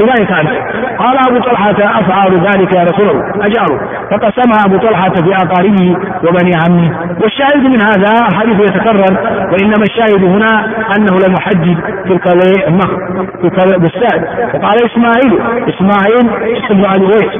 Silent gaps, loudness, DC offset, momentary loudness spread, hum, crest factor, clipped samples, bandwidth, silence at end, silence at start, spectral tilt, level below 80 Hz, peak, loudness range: none; -9 LUFS; under 0.1%; 5 LU; none; 8 dB; 0.2%; 3.7 kHz; 0 s; 0 s; -9.5 dB/octave; -42 dBFS; 0 dBFS; 1 LU